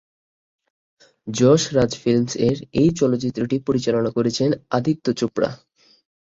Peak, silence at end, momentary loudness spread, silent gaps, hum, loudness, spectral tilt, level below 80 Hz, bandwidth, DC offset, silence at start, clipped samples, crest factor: -2 dBFS; 0.65 s; 7 LU; none; none; -20 LUFS; -6 dB/octave; -50 dBFS; 7.8 kHz; under 0.1%; 1.25 s; under 0.1%; 18 dB